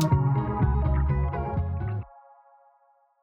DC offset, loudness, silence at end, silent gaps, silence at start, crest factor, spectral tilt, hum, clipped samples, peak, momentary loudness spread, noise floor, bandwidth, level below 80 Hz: under 0.1%; -27 LUFS; 1.15 s; none; 0 s; 16 dB; -8 dB/octave; none; under 0.1%; -10 dBFS; 9 LU; -64 dBFS; 7.8 kHz; -32 dBFS